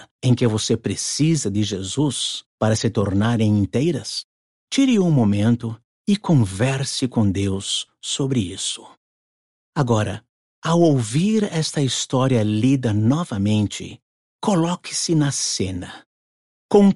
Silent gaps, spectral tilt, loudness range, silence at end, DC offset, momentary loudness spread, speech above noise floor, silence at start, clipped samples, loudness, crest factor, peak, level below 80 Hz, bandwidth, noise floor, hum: 0.11-0.19 s, 2.46-2.58 s, 4.24-4.67 s, 5.84-6.05 s, 8.97-9.73 s, 10.29-10.62 s, 14.02-14.39 s, 16.06-16.69 s; -5.5 dB/octave; 4 LU; 0 s; under 0.1%; 9 LU; over 71 dB; 0 s; under 0.1%; -20 LUFS; 16 dB; -4 dBFS; -54 dBFS; 11.5 kHz; under -90 dBFS; none